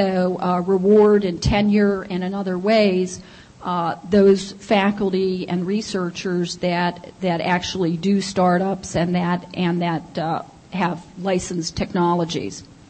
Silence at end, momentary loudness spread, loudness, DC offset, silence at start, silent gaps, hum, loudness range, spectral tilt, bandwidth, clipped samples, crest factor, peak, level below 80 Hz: 0.25 s; 9 LU; -20 LUFS; under 0.1%; 0 s; none; none; 5 LU; -6 dB/octave; 8.8 kHz; under 0.1%; 16 dB; -4 dBFS; -44 dBFS